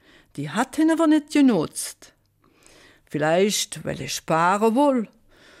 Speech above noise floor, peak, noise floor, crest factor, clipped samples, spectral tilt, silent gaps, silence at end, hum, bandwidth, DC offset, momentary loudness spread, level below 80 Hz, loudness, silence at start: 39 dB; -8 dBFS; -60 dBFS; 14 dB; under 0.1%; -4.5 dB/octave; none; 0.55 s; none; 15.5 kHz; under 0.1%; 14 LU; -60 dBFS; -21 LUFS; 0.35 s